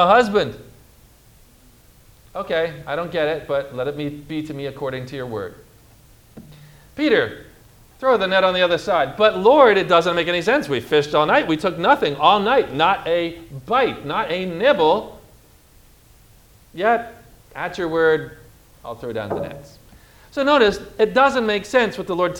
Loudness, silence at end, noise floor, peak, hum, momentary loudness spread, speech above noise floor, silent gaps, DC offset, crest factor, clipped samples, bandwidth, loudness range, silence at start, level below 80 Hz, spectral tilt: -19 LUFS; 0 s; -50 dBFS; 0 dBFS; none; 15 LU; 32 dB; none; under 0.1%; 20 dB; under 0.1%; 18 kHz; 10 LU; 0 s; -50 dBFS; -5 dB/octave